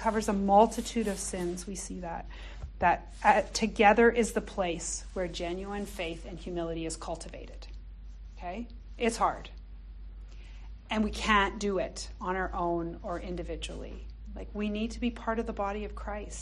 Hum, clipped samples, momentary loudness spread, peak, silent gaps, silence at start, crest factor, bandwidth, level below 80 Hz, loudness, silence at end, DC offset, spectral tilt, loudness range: none; under 0.1%; 23 LU; -8 dBFS; none; 0 s; 22 dB; 12.5 kHz; -44 dBFS; -30 LUFS; 0 s; under 0.1%; -4.5 dB/octave; 9 LU